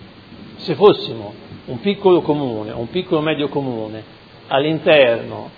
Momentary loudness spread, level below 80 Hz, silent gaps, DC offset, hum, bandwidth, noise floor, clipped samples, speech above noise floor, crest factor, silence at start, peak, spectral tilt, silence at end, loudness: 18 LU; -56 dBFS; none; under 0.1%; none; 5 kHz; -39 dBFS; under 0.1%; 22 dB; 18 dB; 0 s; 0 dBFS; -8.5 dB/octave; 0.1 s; -17 LUFS